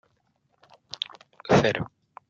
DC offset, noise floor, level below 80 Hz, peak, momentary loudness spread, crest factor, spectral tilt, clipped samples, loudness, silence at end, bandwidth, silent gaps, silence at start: under 0.1%; -70 dBFS; -58 dBFS; -6 dBFS; 20 LU; 22 dB; -5.5 dB/octave; under 0.1%; -25 LUFS; 0.45 s; 7.6 kHz; none; 1.45 s